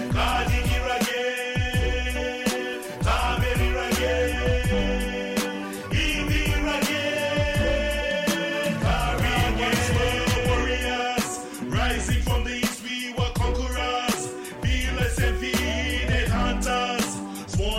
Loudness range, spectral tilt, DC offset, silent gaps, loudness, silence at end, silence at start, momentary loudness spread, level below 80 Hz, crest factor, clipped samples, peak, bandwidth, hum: 2 LU; -4.5 dB/octave; under 0.1%; none; -25 LUFS; 0 s; 0 s; 5 LU; -30 dBFS; 10 dB; under 0.1%; -14 dBFS; 16 kHz; none